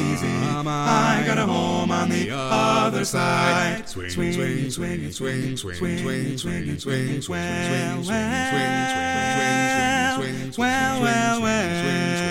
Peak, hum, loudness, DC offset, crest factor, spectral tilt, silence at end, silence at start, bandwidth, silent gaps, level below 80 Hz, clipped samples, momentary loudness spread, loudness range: -6 dBFS; none; -22 LUFS; under 0.1%; 16 dB; -4.5 dB/octave; 0 s; 0 s; 16.5 kHz; none; -50 dBFS; under 0.1%; 8 LU; 5 LU